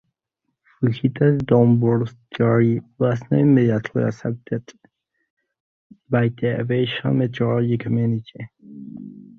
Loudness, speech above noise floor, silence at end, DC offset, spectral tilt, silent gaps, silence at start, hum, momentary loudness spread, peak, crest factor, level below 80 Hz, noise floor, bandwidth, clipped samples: -20 LUFS; 58 dB; 0.15 s; under 0.1%; -9 dB/octave; 5.30-5.37 s, 5.60-5.90 s; 0.8 s; none; 19 LU; -2 dBFS; 18 dB; -56 dBFS; -77 dBFS; 6.6 kHz; under 0.1%